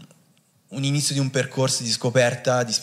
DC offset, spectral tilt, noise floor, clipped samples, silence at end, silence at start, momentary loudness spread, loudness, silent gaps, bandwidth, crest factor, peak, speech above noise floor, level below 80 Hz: under 0.1%; -4 dB/octave; -60 dBFS; under 0.1%; 0 s; 0 s; 5 LU; -22 LUFS; none; 15 kHz; 18 dB; -6 dBFS; 39 dB; -68 dBFS